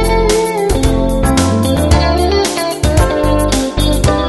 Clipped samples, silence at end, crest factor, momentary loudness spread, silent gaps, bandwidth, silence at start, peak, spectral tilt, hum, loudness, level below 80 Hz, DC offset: under 0.1%; 0 s; 12 dB; 3 LU; none; 12.5 kHz; 0 s; 0 dBFS; -5 dB/octave; none; -13 LUFS; -18 dBFS; under 0.1%